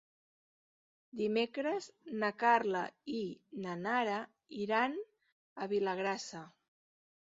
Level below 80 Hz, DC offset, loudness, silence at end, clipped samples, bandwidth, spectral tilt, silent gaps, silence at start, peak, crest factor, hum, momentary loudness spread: -82 dBFS; under 0.1%; -36 LUFS; 0.9 s; under 0.1%; 7.6 kHz; -3 dB/octave; 5.32-5.56 s; 1.15 s; -16 dBFS; 22 dB; none; 15 LU